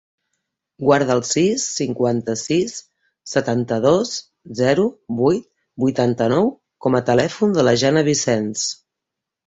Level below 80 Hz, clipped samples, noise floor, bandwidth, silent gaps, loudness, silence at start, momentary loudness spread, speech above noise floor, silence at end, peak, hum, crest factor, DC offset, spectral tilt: -56 dBFS; under 0.1%; -83 dBFS; 8.4 kHz; none; -19 LUFS; 0.8 s; 9 LU; 65 dB; 0.7 s; -2 dBFS; none; 18 dB; under 0.1%; -4.5 dB/octave